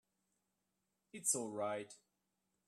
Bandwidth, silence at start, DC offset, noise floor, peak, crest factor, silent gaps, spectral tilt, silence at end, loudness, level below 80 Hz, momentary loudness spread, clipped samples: 13.5 kHz; 1.15 s; under 0.1%; -87 dBFS; -22 dBFS; 24 dB; none; -2.5 dB/octave; 0.7 s; -40 LUFS; under -90 dBFS; 18 LU; under 0.1%